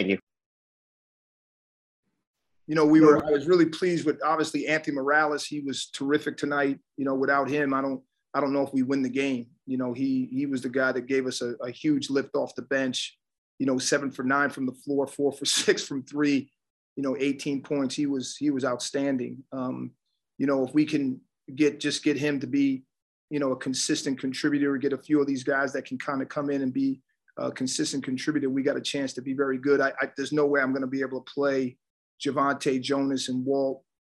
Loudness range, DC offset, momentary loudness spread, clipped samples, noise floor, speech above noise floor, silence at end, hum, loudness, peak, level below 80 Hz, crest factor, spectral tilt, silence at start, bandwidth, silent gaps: 5 LU; under 0.1%; 9 LU; under 0.1%; under -90 dBFS; over 64 dB; 0.4 s; none; -27 LUFS; -6 dBFS; -72 dBFS; 22 dB; -4.5 dB/octave; 0 s; 12.5 kHz; 0.23-0.27 s, 0.46-2.03 s, 2.27-2.34 s, 13.38-13.58 s, 16.70-16.96 s, 23.02-23.28 s, 31.90-32.18 s